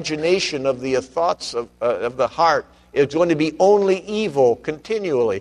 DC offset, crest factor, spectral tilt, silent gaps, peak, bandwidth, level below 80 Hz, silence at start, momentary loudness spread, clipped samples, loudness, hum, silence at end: under 0.1%; 16 dB; -5 dB/octave; none; -4 dBFS; 11 kHz; -54 dBFS; 0 s; 8 LU; under 0.1%; -20 LUFS; none; 0 s